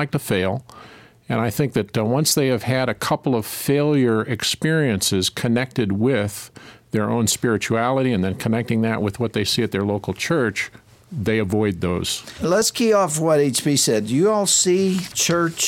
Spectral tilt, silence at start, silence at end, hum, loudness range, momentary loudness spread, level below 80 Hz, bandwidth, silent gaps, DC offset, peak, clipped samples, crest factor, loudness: -4 dB/octave; 0 s; 0 s; none; 4 LU; 7 LU; -52 dBFS; 17 kHz; none; under 0.1%; -6 dBFS; under 0.1%; 14 dB; -20 LUFS